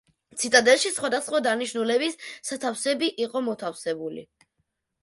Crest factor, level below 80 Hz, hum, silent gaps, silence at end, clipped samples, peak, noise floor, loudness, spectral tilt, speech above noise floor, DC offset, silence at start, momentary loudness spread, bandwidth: 22 dB; -72 dBFS; none; none; 0.8 s; under 0.1%; -4 dBFS; -77 dBFS; -24 LUFS; -1.5 dB/octave; 52 dB; under 0.1%; 0.35 s; 14 LU; 11.5 kHz